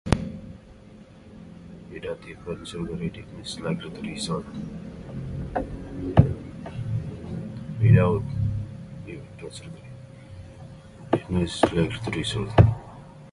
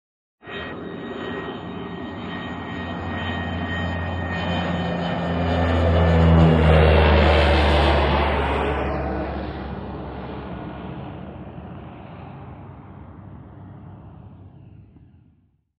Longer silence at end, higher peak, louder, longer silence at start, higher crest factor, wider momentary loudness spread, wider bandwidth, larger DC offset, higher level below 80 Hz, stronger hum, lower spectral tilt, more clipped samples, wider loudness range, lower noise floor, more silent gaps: second, 0 s vs 0.95 s; first, 0 dBFS vs -4 dBFS; second, -26 LUFS vs -21 LUFS; second, 0.05 s vs 0.45 s; first, 26 dB vs 18 dB; about the same, 24 LU vs 25 LU; first, 11.5 kHz vs 7.2 kHz; neither; second, -40 dBFS vs -28 dBFS; neither; about the same, -7 dB/octave vs -8 dB/octave; neither; second, 10 LU vs 22 LU; second, -47 dBFS vs -60 dBFS; neither